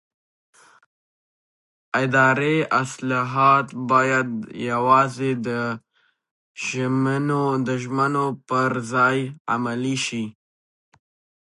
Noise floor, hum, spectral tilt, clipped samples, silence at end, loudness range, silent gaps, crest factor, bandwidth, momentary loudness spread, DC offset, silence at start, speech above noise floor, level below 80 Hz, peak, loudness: under -90 dBFS; none; -5.5 dB/octave; under 0.1%; 1.15 s; 4 LU; 6.31-6.55 s, 9.40-9.45 s; 20 dB; 11.5 kHz; 10 LU; under 0.1%; 1.95 s; over 69 dB; -70 dBFS; -4 dBFS; -21 LUFS